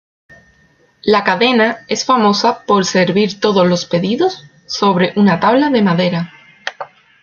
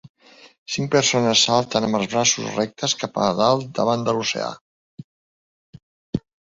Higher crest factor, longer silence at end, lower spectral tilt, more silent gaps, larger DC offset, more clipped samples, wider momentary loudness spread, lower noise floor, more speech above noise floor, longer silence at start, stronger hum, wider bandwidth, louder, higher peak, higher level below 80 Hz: second, 14 dB vs 20 dB; about the same, 0.35 s vs 0.3 s; first, -5 dB/octave vs -3 dB/octave; second, none vs 0.09-0.15 s, 0.58-0.66 s, 4.61-4.98 s, 5.04-5.73 s, 5.83-6.13 s; neither; neither; first, 15 LU vs 12 LU; second, -53 dBFS vs under -90 dBFS; second, 40 dB vs over 70 dB; first, 1.05 s vs 0.05 s; neither; second, 7.2 kHz vs 8 kHz; first, -14 LUFS vs -20 LUFS; first, 0 dBFS vs -4 dBFS; about the same, -56 dBFS vs -56 dBFS